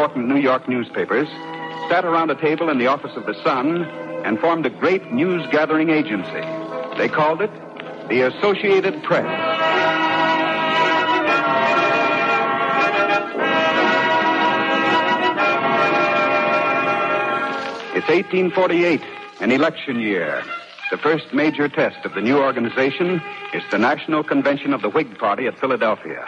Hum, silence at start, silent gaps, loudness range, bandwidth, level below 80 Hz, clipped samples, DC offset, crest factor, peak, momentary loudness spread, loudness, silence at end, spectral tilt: none; 0 s; none; 3 LU; 9 kHz; -68 dBFS; under 0.1%; under 0.1%; 14 dB; -6 dBFS; 8 LU; -19 LUFS; 0 s; -6 dB/octave